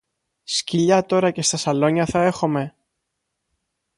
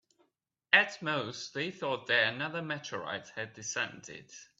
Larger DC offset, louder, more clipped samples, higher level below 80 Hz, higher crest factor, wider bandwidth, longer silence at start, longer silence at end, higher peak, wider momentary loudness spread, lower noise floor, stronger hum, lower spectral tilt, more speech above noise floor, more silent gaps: neither; first, -20 LUFS vs -32 LUFS; neither; first, -54 dBFS vs -78 dBFS; second, 18 dB vs 28 dB; first, 11.5 kHz vs 8 kHz; second, 0.5 s vs 0.7 s; first, 1.3 s vs 0.15 s; first, -4 dBFS vs -8 dBFS; second, 7 LU vs 15 LU; about the same, -77 dBFS vs -79 dBFS; neither; first, -4.5 dB/octave vs -2.5 dB/octave; first, 58 dB vs 44 dB; neither